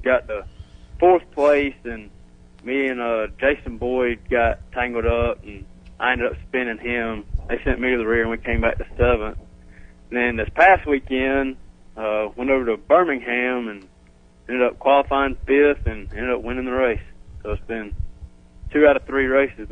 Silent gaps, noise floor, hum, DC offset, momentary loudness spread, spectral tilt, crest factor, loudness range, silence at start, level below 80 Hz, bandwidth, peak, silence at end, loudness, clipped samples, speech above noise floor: none; -51 dBFS; none; under 0.1%; 15 LU; -7.5 dB/octave; 18 dB; 3 LU; 0 s; -34 dBFS; 9.2 kHz; -2 dBFS; 0 s; -21 LUFS; under 0.1%; 30 dB